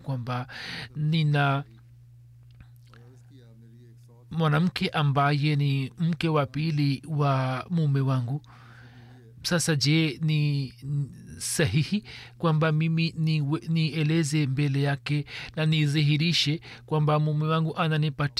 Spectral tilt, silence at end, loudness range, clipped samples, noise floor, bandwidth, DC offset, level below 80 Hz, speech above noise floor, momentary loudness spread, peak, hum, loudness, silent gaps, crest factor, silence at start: -5.5 dB/octave; 0.1 s; 5 LU; under 0.1%; -51 dBFS; 13.5 kHz; under 0.1%; -60 dBFS; 26 dB; 9 LU; -12 dBFS; none; -26 LUFS; none; 14 dB; 0 s